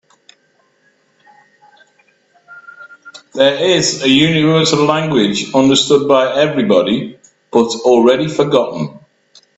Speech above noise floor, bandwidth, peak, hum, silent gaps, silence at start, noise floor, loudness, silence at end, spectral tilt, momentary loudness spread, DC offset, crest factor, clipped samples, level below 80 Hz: 45 dB; 8.4 kHz; 0 dBFS; none; none; 2.5 s; -58 dBFS; -12 LUFS; 0.6 s; -4.5 dB/octave; 8 LU; under 0.1%; 14 dB; under 0.1%; -54 dBFS